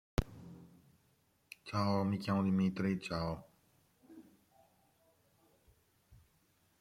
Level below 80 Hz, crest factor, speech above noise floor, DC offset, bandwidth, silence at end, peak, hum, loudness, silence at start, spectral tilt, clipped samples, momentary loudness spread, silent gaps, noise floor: -56 dBFS; 22 dB; 40 dB; under 0.1%; 14.5 kHz; 0.65 s; -18 dBFS; none; -36 LUFS; 0.2 s; -7 dB/octave; under 0.1%; 22 LU; none; -74 dBFS